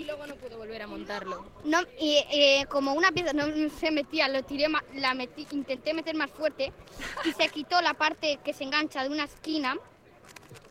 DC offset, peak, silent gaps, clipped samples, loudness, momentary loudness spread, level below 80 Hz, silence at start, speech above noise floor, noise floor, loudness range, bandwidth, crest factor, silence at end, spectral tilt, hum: under 0.1%; -8 dBFS; none; under 0.1%; -28 LUFS; 14 LU; -58 dBFS; 0 s; 24 dB; -52 dBFS; 5 LU; 16 kHz; 20 dB; 0.05 s; -3 dB/octave; none